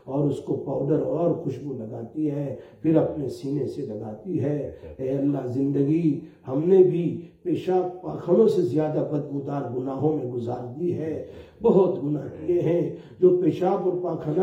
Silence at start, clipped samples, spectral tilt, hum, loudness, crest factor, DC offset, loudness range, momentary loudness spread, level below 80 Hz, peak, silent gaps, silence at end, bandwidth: 0.05 s; under 0.1%; -10 dB/octave; none; -25 LUFS; 18 dB; under 0.1%; 5 LU; 12 LU; -60 dBFS; -6 dBFS; none; 0 s; 8 kHz